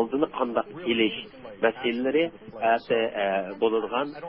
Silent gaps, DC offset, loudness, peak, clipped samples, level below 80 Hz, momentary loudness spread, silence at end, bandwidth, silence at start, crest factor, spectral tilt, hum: none; under 0.1%; -26 LUFS; -8 dBFS; under 0.1%; -64 dBFS; 5 LU; 0 s; 5.6 kHz; 0 s; 18 dB; -9 dB/octave; none